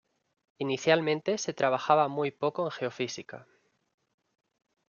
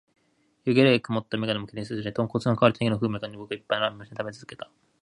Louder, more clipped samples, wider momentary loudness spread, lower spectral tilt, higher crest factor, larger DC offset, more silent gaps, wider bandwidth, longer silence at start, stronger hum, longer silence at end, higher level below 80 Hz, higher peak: second, -29 LUFS vs -26 LUFS; neither; second, 12 LU vs 16 LU; second, -4.5 dB/octave vs -7 dB/octave; about the same, 22 dB vs 22 dB; neither; neither; second, 7.4 kHz vs 11 kHz; about the same, 0.6 s vs 0.65 s; neither; first, 1.45 s vs 0.4 s; second, -78 dBFS vs -60 dBFS; second, -8 dBFS vs -4 dBFS